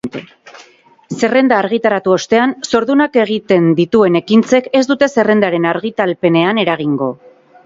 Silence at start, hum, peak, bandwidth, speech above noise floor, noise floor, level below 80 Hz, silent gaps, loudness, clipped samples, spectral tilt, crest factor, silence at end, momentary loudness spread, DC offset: 0.05 s; none; 0 dBFS; 7.8 kHz; 33 dB; -46 dBFS; -56 dBFS; none; -13 LUFS; under 0.1%; -5.5 dB/octave; 14 dB; 0.5 s; 6 LU; under 0.1%